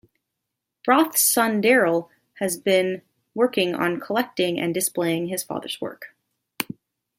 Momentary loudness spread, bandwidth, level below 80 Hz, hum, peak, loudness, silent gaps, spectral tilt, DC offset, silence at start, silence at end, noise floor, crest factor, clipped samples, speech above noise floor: 14 LU; 16.5 kHz; -72 dBFS; none; -2 dBFS; -22 LUFS; none; -3 dB/octave; under 0.1%; 0.85 s; 0.55 s; -82 dBFS; 20 dB; under 0.1%; 60 dB